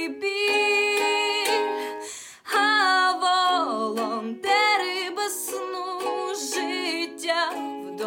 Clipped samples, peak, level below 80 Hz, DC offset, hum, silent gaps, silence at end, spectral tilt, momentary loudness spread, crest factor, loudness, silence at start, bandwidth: under 0.1%; -10 dBFS; -82 dBFS; under 0.1%; none; none; 0 s; -0.5 dB/octave; 11 LU; 14 dB; -23 LUFS; 0 s; 17 kHz